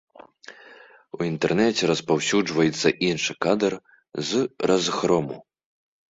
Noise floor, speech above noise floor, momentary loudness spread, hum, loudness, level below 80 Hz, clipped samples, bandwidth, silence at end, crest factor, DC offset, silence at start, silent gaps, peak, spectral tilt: -49 dBFS; 27 dB; 15 LU; none; -23 LUFS; -60 dBFS; under 0.1%; 8 kHz; 0.7 s; 20 dB; under 0.1%; 0.5 s; none; -4 dBFS; -4.5 dB/octave